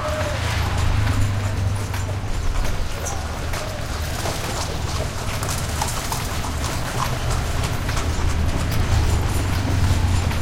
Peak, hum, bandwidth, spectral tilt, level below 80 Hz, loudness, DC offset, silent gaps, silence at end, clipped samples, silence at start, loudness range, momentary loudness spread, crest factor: -6 dBFS; none; 17 kHz; -4.5 dB/octave; -26 dBFS; -24 LUFS; under 0.1%; none; 0 s; under 0.1%; 0 s; 4 LU; 6 LU; 14 dB